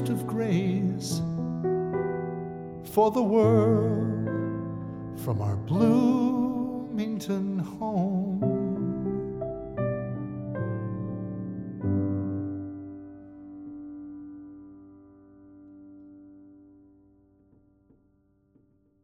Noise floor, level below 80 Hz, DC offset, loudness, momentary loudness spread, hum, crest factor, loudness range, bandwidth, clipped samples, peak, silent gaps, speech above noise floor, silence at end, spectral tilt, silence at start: -66 dBFS; -58 dBFS; under 0.1%; -28 LUFS; 20 LU; none; 20 dB; 19 LU; 16 kHz; under 0.1%; -10 dBFS; none; 41 dB; 2.45 s; -8 dB/octave; 0 s